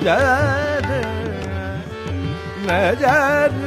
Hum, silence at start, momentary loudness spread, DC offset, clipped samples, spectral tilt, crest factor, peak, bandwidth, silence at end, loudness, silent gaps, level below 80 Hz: none; 0 s; 11 LU; under 0.1%; under 0.1%; -6 dB/octave; 14 dB; -4 dBFS; 15.5 kHz; 0 s; -19 LUFS; none; -38 dBFS